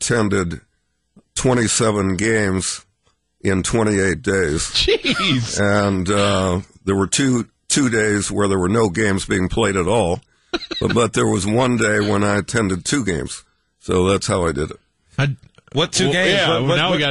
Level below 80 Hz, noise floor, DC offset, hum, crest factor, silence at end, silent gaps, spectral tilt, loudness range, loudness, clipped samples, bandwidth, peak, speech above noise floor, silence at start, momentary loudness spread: -40 dBFS; -65 dBFS; 0.2%; none; 14 dB; 0 s; none; -4 dB/octave; 3 LU; -18 LUFS; under 0.1%; 11.5 kHz; -4 dBFS; 47 dB; 0 s; 9 LU